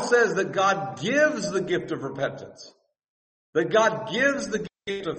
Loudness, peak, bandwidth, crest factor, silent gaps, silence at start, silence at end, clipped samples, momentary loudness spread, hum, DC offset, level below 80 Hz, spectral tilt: -24 LUFS; -6 dBFS; 8.8 kHz; 18 dB; 3.08-3.53 s; 0 s; 0 s; under 0.1%; 11 LU; none; under 0.1%; -64 dBFS; -4 dB/octave